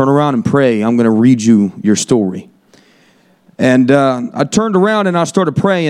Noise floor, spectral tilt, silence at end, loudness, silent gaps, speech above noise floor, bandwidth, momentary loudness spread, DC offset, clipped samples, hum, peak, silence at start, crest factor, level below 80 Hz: -50 dBFS; -6 dB/octave; 0 s; -12 LUFS; none; 39 dB; 11.5 kHz; 6 LU; under 0.1%; under 0.1%; none; 0 dBFS; 0 s; 12 dB; -52 dBFS